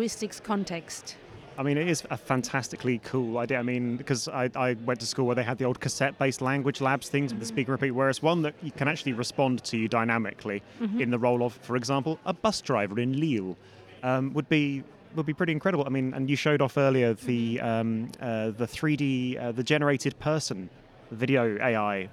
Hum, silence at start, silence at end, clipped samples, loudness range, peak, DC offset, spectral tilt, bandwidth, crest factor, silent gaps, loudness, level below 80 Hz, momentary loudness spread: none; 0 s; 0 s; under 0.1%; 2 LU; -10 dBFS; under 0.1%; -5.5 dB/octave; 15 kHz; 18 dB; none; -28 LUFS; -64 dBFS; 8 LU